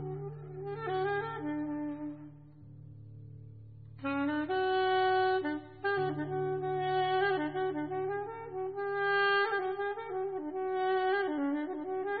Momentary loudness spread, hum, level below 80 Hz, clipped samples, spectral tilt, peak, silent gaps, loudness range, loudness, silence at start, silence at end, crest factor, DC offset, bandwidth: 22 LU; none; -68 dBFS; under 0.1%; -3.5 dB/octave; -18 dBFS; none; 7 LU; -33 LUFS; 0 s; 0 s; 16 dB; under 0.1%; 4.8 kHz